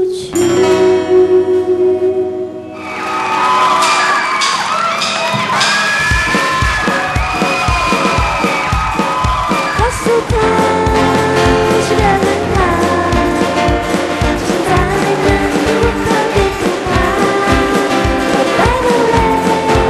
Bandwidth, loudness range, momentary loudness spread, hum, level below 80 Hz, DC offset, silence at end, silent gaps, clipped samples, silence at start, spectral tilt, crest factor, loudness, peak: 13 kHz; 1 LU; 4 LU; none; -26 dBFS; under 0.1%; 0 s; none; under 0.1%; 0 s; -4.5 dB/octave; 12 dB; -12 LUFS; 0 dBFS